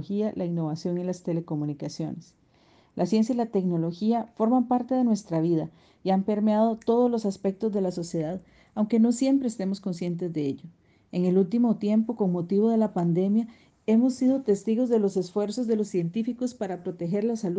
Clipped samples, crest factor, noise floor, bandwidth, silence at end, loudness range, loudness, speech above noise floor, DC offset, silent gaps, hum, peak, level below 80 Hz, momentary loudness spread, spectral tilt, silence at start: under 0.1%; 14 dB; -60 dBFS; 9.4 kHz; 0 s; 4 LU; -26 LUFS; 35 dB; under 0.1%; none; none; -12 dBFS; -68 dBFS; 10 LU; -8 dB/octave; 0 s